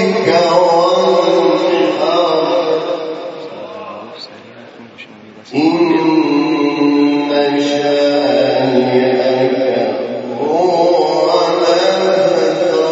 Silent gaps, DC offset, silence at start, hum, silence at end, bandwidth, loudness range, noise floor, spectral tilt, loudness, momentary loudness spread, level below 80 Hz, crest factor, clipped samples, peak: none; under 0.1%; 0 s; none; 0 s; 8 kHz; 6 LU; -36 dBFS; -5.5 dB/octave; -13 LUFS; 13 LU; -66 dBFS; 14 dB; under 0.1%; 0 dBFS